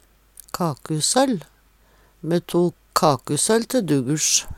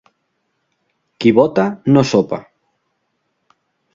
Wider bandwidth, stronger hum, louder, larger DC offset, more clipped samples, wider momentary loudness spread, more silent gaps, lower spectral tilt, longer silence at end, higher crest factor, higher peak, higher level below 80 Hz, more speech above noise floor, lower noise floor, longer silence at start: first, 17.5 kHz vs 7.6 kHz; neither; second, -21 LUFS vs -15 LUFS; neither; neither; about the same, 8 LU vs 8 LU; neither; second, -4 dB/octave vs -7 dB/octave; second, 0 s vs 1.55 s; about the same, 20 dB vs 18 dB; about the same, -2 dBFS vs 0 dBFS; about the same, -52 dBFS vs -54 dBFS; second, 36 dB vs 56 dB; second, -56 dBFS vs -69 dBFS; second, 0.55 s vs 1.2 s